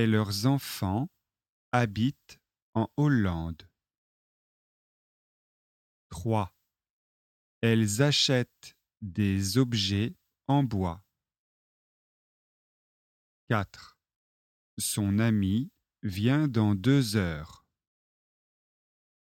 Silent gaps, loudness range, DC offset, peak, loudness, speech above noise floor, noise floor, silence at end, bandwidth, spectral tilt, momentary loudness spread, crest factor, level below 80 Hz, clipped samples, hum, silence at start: 1.50-1.72 s, 2.62-2.73 s, 3.98-6.10 s, 6.90-7.61 s, 11.39-13.47 s, 14.16-14.77 s; 11 LU; under 0.1%; -10 dBFS; -28 LUFS; over 63 dB; under -90 dBFS; 1.75 s; 16.5 kHz; -5.5 dB/octave; 15 LU; 22 dB; -58 dBFS; under 0.1%; none; 0 s